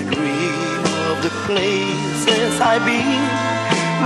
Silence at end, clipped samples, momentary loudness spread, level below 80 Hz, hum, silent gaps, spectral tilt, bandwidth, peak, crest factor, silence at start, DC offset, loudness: 0 s; under 0.1%; 4 LU; -54 dBFS; none; none; -4 dB/octave; 12.5 kHz; 0 dBFS; 18 dB; 0 s; under 0.1%; -18 LUFS